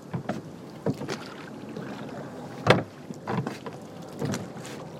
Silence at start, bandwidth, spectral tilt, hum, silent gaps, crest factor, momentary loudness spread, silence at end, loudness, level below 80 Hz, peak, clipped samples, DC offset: 0 s; 16 kHz; -5.5 dB/octave; none; none; 30 dB; 17 LU; 0 s; -32 LUFS; -66 dBFS; -2 dBFS; under 0.1%; under 0.1%